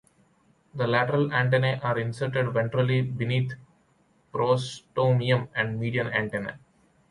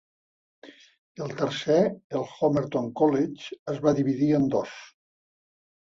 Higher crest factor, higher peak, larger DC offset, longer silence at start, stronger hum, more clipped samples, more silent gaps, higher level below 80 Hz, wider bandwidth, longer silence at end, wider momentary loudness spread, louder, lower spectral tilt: about the same, 18 dB vs 18 dB; about the same, -8 dBFS vs -8 dBFS; neither; about the same, 0.75 s vs 0.65 s; neither; neither; second, none vs 0.98-1.15 s, 2.04-2.10 s, 3.59-3.66 s; about the same, -62 dBFS vs -64 dBFS; first, 11 kHz vs 7.6 kHz; second, 0.55 s vs 1.05 s; second, 10 LU vs 13 LU; about the same, -26 LUFS vs -26 LUFS; about the same, -7 dB/octave vs -7 dB/octave